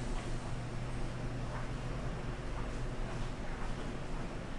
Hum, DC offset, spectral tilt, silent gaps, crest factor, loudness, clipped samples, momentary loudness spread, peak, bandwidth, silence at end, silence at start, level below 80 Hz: none; 0.2%; -6 dB/octave; none; 12 dB; -42 LUFS; under 0.1%; 2 LU; -26 dBFS; 11 kHz; 0 s; 0 s; -42 dBFS